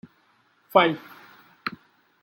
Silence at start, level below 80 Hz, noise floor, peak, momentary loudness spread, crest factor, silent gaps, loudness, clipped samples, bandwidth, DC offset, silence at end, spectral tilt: 0.75 s; -76 dBFS; -64 dBFS; -4 dBFS; 16 LU; 24 dB; none; -24 LUFS; under 0.1%; 17 kHz; under 0.1%; 0.55 s; -6.5 dB/octave